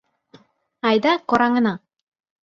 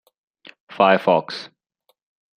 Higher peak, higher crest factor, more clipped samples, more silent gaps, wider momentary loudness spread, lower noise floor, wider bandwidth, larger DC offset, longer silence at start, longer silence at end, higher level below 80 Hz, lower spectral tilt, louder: about the same, -4 dBFS vs -2 dBFS; about the same, 18 dB vs 22 dB; neither; neither; second, 7 LU vs 25 LU; second, -53 dBFS vs -68 dBFS; second, 7.2 kHz vs 10 kHz; neither; first, 0.85 s vs 0.7 s; second, 0.65 s vs 0.9 s; first, -62 dBFS vs -72 dBFS; about the same, -6 dB/octave vs -6 dB/octave; about the same, -19 LUFS vs -18 LUFS